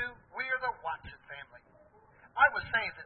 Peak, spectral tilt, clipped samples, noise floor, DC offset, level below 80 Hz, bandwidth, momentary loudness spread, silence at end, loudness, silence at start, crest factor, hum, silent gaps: -10 dBFS; 0.5 dB/octave; under 0.1%; -61 dBFS; under 0.1%; -62 dBFS; 4.3 kHz; 21 LU; 0 s; -31 LUFS; 0 s; 24 dB; none; none